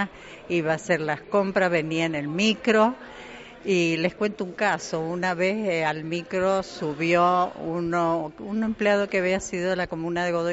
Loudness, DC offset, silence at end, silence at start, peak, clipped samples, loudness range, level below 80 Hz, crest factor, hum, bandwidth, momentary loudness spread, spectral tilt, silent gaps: -24 LUFS; under 0.1%; 0 s; 0 s; -8 dBFS; under 0.1%; 2 LU; -58 dBFS; 18 dB; none; 8 kHz; 8 LU; -4 dB/octave; none